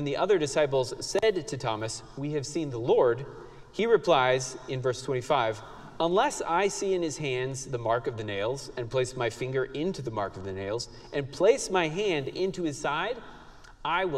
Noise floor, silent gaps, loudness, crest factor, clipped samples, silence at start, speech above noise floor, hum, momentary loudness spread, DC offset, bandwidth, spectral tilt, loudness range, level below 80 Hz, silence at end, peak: -48 dBFS; none; -28 LUFS; 20 dB; under 0.1%; 0 s; 20 dB; none; 11 LU; under 0.1%; 13 kHz; -4.5 dB/octave; 4 LU; -54 dBFS; 0 s; -10 dBFS